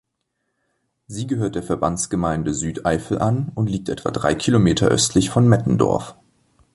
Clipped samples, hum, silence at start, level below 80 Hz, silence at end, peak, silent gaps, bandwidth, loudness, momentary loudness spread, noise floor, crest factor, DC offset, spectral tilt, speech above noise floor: under 0.1%; none; 1.1 s; -42 dBFS; 0.65 s; -2 dBFS; none; 11.5 kHz; -20 LUFS; 9 LU; -75 dBFS; 18 dB; under 0.1%; -5.5 dB/octave; 56 dB